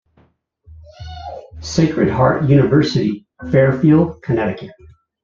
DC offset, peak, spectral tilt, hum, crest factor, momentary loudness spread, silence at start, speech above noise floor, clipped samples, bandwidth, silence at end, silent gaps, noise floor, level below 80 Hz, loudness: under 0.1%; -2 dBFS; -7.5 dB/octave; none; 14 dB; 20 LU; 0.7 s; 42 dB; under 0.1%; 7.6 kHz; 0.55 s; none; -57 dBFS; -44 dBFS; -15 LUFS